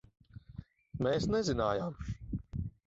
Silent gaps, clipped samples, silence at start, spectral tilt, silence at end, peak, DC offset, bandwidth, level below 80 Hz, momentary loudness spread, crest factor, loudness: none; under 0.1%; 0.35 s; -6 dB/octave; 0.15 s; -18 dBFS; under 0.1%; 7.6 kHz; -50 dBFS; 20 LU; 18 dB; -35 LUFS